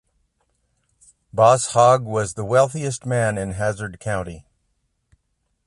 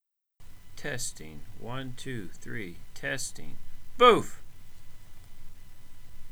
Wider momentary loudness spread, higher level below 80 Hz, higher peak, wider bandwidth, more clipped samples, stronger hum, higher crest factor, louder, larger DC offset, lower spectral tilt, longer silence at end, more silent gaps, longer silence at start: second, 12 LU vs 27 LU; about the same, -50 dBFS vs -46 dBFS; first, -2 dBFS vs -6 dBFS; second, 11.5 kHz vs over 20 kHz; neither; neither; about the same, 20 dB vs 24 dB; first, -20 LUFS vs -29 LUFS; neither; first, -5 dB/octave vs -3.5 dB/octave; first, 1.25 s vs 0 s; neither; first, 1.35 s vs 0.4 s